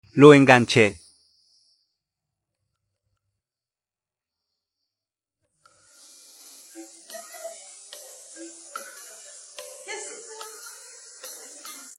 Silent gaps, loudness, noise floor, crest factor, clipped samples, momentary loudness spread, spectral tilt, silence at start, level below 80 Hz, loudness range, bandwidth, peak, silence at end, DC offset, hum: none; -15 LUFS; under -90 dBFS; 26 dB; under 0.1%; 28 LU; -5 dB/octave; 0.15 s; -68 dBFS; 24 LU; 13.5 kHz; 0 dBFS; 0.7 s; under 0.1%; none